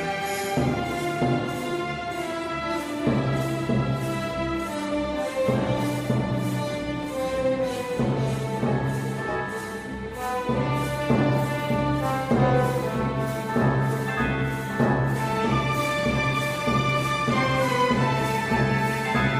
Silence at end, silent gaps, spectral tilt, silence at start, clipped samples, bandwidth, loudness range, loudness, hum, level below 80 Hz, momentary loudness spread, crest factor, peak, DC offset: 0 s; none; -6 dB/octave; 0 s; under 0.1%; 15.5 kHz; 4 LU; -25 LUFS; none; -44 dBFS; 6 LU; 16 dB; -8 dBFS; under 0.1%